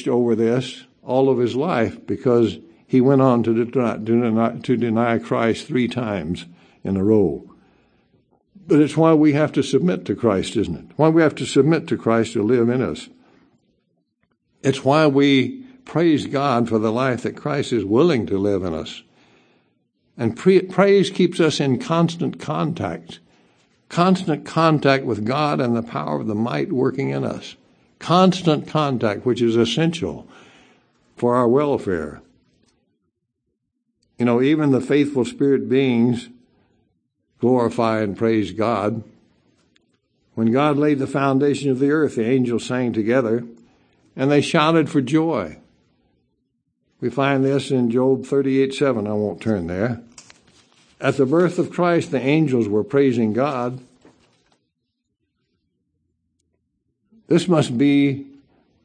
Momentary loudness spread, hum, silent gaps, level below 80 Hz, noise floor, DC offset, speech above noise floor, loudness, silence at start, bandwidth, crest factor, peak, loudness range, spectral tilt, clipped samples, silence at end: 10 LU; none; none; -58 dBFS; -76 dBFS; under 0.1%; 57 dB; -19 LUFS; 0 s; 9.8 kHz; 20 dB; 0 dBFS; 4 LU; -7 dB/octave; under 0.1%; 0.6 s